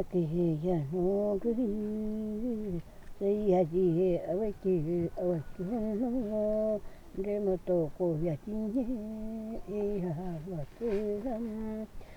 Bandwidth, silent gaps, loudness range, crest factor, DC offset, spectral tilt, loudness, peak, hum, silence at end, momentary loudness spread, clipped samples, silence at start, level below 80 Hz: 19 kHz; none; 4 LU; 16 dB; under 0.1%; -10 dB/octave; -33 LUFS; -16 dBFS; none; 0 s; 11 LU; under 0.1%; 0 s; -48 dBFS